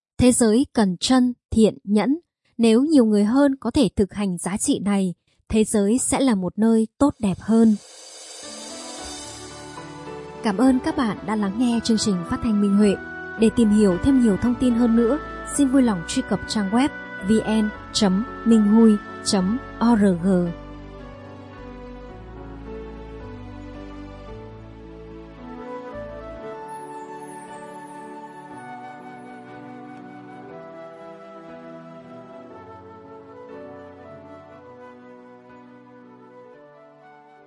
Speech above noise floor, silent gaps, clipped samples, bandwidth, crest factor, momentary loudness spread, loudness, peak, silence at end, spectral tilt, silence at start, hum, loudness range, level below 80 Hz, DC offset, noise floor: 29 dB; 1.45-1.49 s; under 0.1%; 11.5 kHz; 18 dB; 23 LU; -20 LUFS; -4 dBFS; 1.05 s; -5.5 dB/octave; 0.2 s; none; 21 LU; -46 dBFS; under 0.1%; -48 dBFS